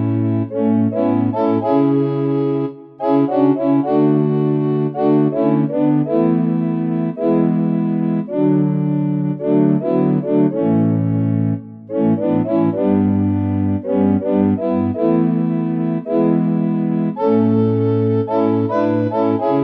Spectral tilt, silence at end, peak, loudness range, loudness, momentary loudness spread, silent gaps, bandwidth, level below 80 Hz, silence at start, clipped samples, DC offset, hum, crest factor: -12 dB/octave; 0 s; -2 dBFS; 1 LU; -17 LUFS; 4 LU; none; 4.7 kHz; -62 dBFS; 0 s; under 0.1%; under 0.1%; none; 14 dB